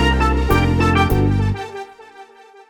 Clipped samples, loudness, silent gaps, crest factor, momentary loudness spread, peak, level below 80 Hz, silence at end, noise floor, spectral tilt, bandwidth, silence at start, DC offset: under 0.1%; -17 LUFS; none; 16 dB; 16 LU; -2 dBFS; -24 dBFS; 0.45 s; -43 dBFS; -6.5 dB/octave; over 20 kHz; 0 s; under 0.1%